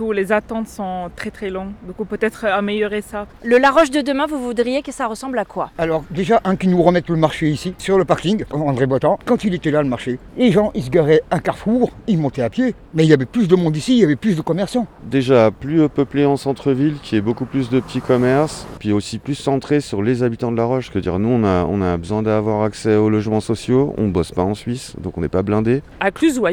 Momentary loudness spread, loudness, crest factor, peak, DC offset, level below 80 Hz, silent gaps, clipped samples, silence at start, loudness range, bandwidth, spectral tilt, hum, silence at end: 10 LU; -18 LUFS; 18 dB; 0 dBFS; under 0.1%; -42 dBFS; none; under 0.1%; 0 s; 3 LU; 16.5 kHz; -6.5 dB/octave; none; 0 s